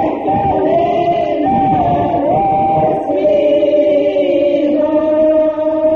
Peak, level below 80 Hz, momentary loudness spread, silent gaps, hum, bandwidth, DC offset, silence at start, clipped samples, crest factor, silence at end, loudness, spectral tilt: -2 dBFS; -42 dBFS; 3 LU; none; none; 6.2 kHz; 0.1%; 0 s; under 0.1%; 10 dB; 0 s; -13 LUFS; -9 dB/octave